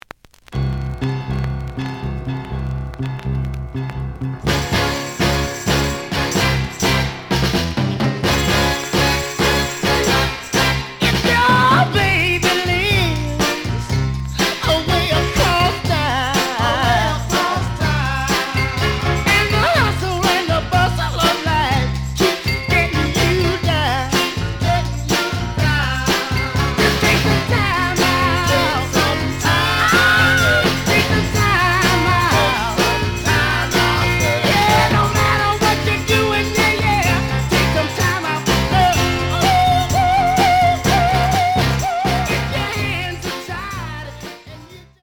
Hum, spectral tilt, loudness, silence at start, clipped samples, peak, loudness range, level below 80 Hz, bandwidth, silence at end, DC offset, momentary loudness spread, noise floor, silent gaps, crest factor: none; -4.5 dB/octave; -16 LUFS; 0.5 s; under 0.1%; -2 dBFS; 5 LU; -30 dBFS; over 20 kHz; 0.2 s; under 0.1%; 10 LU; -42 dBFS; none; 14 dB